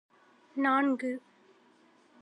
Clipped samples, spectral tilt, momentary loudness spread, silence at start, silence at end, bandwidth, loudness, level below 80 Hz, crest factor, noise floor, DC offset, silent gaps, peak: under 0.1%; -5 dB/octave; 15 LU; 0.55 s; 1 s; 9.4 kHz; -30 LUFS; under -90 dBFS; 18 dB; -63 dBFS; under 0.1%; none; -16 dBFS